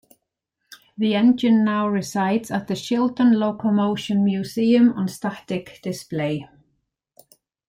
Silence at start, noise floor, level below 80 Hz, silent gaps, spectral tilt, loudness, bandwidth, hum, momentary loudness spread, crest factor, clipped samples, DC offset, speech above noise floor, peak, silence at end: 0.7 s; -78 dBFS; -64 dBFS; none; -6.5 dB/octave; -21 LUFS; 15.5 kHz; none; 13 LU; 14 dB; under 0.1%; under 0.1%; 58 dB; -8 dBFS; 1.25 s